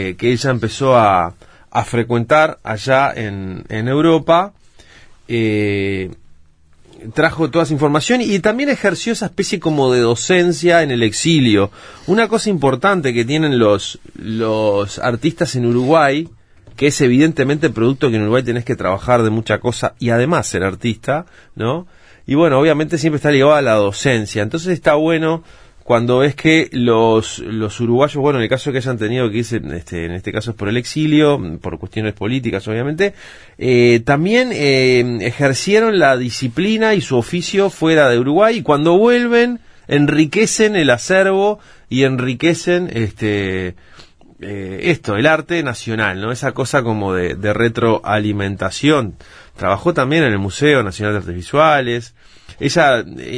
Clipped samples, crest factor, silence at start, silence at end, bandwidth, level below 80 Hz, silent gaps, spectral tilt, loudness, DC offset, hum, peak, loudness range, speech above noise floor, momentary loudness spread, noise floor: under 0.1%; 16 dB; 0 s; 0 s; 11 kHz; -46 dBFS; none; -5.5 dB/octave; -15 LUFS; under 0.1%; none; 0 dBFS; 5 LU; 32 dB; 10 LU; -47 dBFS